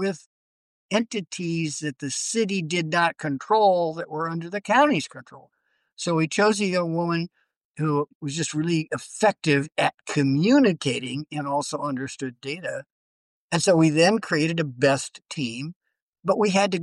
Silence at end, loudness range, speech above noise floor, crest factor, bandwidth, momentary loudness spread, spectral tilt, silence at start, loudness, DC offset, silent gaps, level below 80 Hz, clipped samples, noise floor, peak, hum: 0 s; 3 LU; over 67 dB; 16 dB; 12 kHz; 13 LU; -5 dB/octave; 0 s; -24 LUFS; under 0.1%; 0.26-0.89 s, 5.93-5.97 s, 7.57-7.74 s, 8.15-8.20 s, 12.92-13.50 s, 15.76-15.81 s, 16.02-16.13 s; -68 dBFS; under 0.1%; under -90 dBFS; -8 dBFS; none